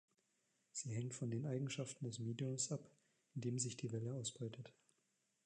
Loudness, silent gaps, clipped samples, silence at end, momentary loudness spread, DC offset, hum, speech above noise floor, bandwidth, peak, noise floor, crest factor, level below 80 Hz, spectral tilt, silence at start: -45 LUFS; none; under 0.1%; 0.75 s; 8 LU; under 0.1%; none; 39 dB; 10.5 kHz; -28 dBFS; -84 dBFS; 18 dB; -84 dBFS; -5 dB/octave; 0.75 s